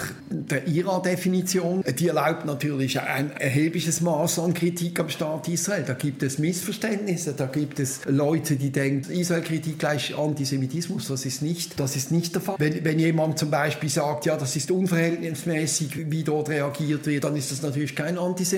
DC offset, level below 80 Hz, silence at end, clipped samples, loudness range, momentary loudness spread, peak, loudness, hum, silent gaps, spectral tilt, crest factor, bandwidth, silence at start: under 0.1%; -66 dBFS; 0 s; under 0.1%; 2 LU; 5 LU; -8 dBFS; -25 LUFS; none; none; -5 dB/octave; 16 dB; 17 kHz; 0 s